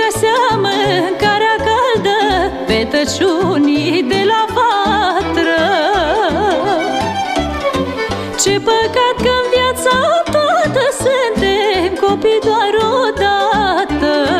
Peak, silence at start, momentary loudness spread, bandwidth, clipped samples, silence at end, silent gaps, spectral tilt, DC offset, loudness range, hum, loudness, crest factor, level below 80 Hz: -2 dBFS; 0 s; 3 LU; 15.5 kHz; under 0.1%; 0 s; none; -4 dB/octave; under 0.1%; 2 LU; none; -13 LUFS; 12 dB; -36 dBFS